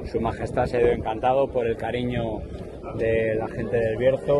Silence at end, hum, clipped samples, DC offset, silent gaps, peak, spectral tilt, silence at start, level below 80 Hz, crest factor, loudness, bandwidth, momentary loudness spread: 0 s; none; under 0.1%; under 0.1%; none; -8 dBFS; -7.5 dB/octave; 0 s; -40 dBFS; 16 dB; -25 LUFS; 11.5 kHz; 9 LU